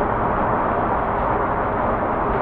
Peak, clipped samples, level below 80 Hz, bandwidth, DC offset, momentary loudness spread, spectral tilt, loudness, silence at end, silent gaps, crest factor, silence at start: -8 dBFS; under 0.1%; -34 dBFS; 4.8 kHz; under 0.1%; 1 LU; -10 dB/octave; -21 LUFS; 0 s; none; 12 dB; 0 s